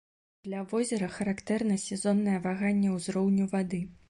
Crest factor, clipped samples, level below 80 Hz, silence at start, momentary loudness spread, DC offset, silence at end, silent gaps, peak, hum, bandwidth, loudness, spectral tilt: 14 dB; under 0.1%; -64 dBFS; 0.45 s; 7 LU; under 0.1%; 0.15 s; none; -16 dBFS; none; 11.5 kHz; -30 LUFS; -6 dB/octave